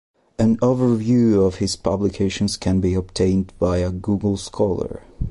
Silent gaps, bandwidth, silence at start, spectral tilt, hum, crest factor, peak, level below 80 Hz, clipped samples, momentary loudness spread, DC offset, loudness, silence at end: none; 11.5 kHz; 0.4 s; -6.5 dB/octave; none; 14 dB; -6 dBFS; -36 dBFS; under 0.1%; 6 LU; under 0.1%; -20 LUFS; 0 s